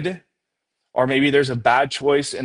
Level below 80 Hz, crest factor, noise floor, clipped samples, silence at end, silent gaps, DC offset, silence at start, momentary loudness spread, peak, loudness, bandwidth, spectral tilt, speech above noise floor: -58 dBFS; 18 dB; -79 dBFS; under 0.1%; 0 s; none; under 0.1%; 0 s; 11 LU; -2 dBFS; -19 LUFS; 11 kHz; -5 dB/octave; 61 dB